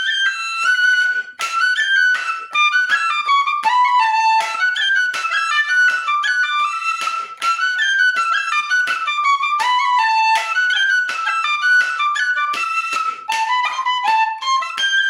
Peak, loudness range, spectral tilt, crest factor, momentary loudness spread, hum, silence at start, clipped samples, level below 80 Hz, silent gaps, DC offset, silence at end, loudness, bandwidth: -4 dBFS; 2 LU; 3.5 dB/octave; 12 dB; 5 LU; none; 0 s; under 0.1%; -82 dBFS; none; under 0.1%; 0 s; -16 LUFS; 16.5 kHz